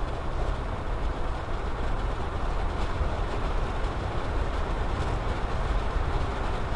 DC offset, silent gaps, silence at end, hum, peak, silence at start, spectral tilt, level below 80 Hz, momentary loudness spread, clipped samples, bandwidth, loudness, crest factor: under 0.1%; none; 0 s; none; -14 dBFS; 0 s; -6.5 dB/octave; -30 dBFS; 3 LU; under 0.1%; 10.5 kHz; -31 LUFS; 12 dB